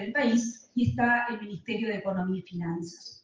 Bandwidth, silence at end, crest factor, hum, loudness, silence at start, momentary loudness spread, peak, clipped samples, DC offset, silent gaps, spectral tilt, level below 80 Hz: 9.4 kHz; 0.1 s; 16 dB; none; -29 LUFS; 0 s; 10 LU; -12 dBFS; under 0.1%; under 0.1%; none; -5.5 dB/octave; -64 dBFS